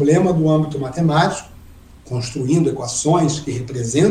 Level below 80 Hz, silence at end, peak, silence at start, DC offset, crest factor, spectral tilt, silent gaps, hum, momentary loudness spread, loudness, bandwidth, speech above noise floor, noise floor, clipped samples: -44 dBFS; 0 s; -2 dBFS; 0 s; under 0.1%; 16 dB; -6 dB/octave; none; none; 10 LU; -18 LUFS; 11.5 kHz; 25 dB; -42 dBFS; under 0.1%